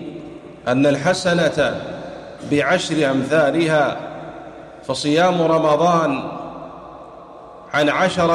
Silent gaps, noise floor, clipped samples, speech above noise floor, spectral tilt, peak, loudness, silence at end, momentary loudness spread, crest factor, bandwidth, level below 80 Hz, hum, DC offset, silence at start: none; -39 dBFS; under 0.1%; 22 dB; -5 dB/octave; -6 dBFS; -18 LUFS; 0 s; 21 LU; 14 dB; 12 kHz; -52 dBFS; none; under 0.1%; 0 s